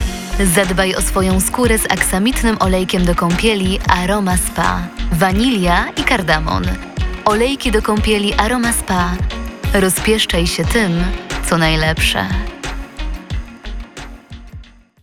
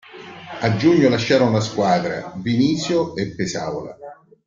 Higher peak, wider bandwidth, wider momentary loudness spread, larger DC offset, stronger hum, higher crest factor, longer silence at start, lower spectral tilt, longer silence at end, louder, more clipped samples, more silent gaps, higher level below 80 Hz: about the same, 0 dBFS vs -2 dBFS; first, 18 kHz vs 7.6 kHz; second, 13 LU vs 19 LU; first, 0.1% vs under 0.1%; neither; about the same, 16 dB vs 18 dB; about the same, 0 s vs 0.1 s; second, -4 dB/octave vs -6 dB/octave; about the same, 0.4 s vs 0.35 s; first, -15 LUFS vs -19 LUFS; neither; neither; first, -24 dBFS vs -54 dBFS